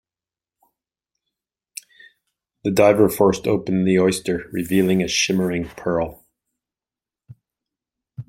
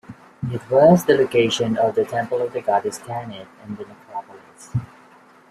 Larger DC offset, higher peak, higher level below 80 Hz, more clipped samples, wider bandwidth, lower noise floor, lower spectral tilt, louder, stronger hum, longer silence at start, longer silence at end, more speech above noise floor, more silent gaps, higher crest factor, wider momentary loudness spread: neither; about the same, -2 dBFS vs -2 dBFS; first, -52 dBFS vs -58 dBFS; neither; about the same, 16.5 kHz vs 15.5 kHz; first, under -90 dBFS vs -50 dBFS; about the same, -5 dB/octave vs -6 dB/octave; about the same, -19 LUFS vs -20 LUFS; neither; first, 2.65 s vs 0.1 s; second, 0.05 s vs 0.65 s; first, over 71 dB vs 30 dB; neither; about the same, 20 dB vs 20 dB; second, 14 LU vs 21 LU